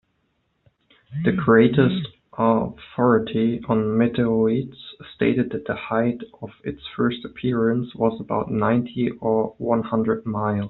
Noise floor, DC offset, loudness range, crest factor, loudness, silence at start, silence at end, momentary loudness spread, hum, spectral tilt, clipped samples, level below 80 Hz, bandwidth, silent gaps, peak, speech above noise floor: -70 dBFS; under 0.1%; 5 LU; 18 dB; -22 LUFS; 1.1 s; 0 s; 14 LU; none; -6.5 dB/octave; under 0.1%; -54 dBFS; 4.1 kHz; none; -2 dBFS; 48 dB